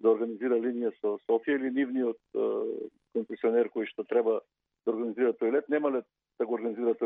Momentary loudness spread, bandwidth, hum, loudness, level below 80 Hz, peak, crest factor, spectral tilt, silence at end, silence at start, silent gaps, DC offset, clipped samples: 8 LU; 3.8 kHz; none; -30 LUFS; -86 dBFS; -14 dBFS; 16 dB; -9 dB/octave; 0 s; 0 s; none; under 0.1%; under 0.1%